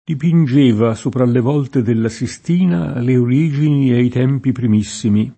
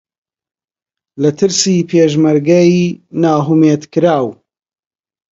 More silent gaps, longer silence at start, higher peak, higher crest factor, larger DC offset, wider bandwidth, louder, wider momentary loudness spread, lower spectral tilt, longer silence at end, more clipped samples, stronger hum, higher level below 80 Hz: neither; second, 0.1 s vs 1.15 s; about the same, -2 dBFS vs 0 dBFS; about the same, 14 dB vs 14 dB; neither; about the same, 8.8 kHz vs 8 kHz; second, -15 LUFS vs -12 LUFS; about the same, 5 LU vs 7 LU; first, -7.5 dB/octave vs -5.5 dB/octave; second, 0.05 s vs 1 s; neither; neither; first, -50 dBFS vs -58 dBFS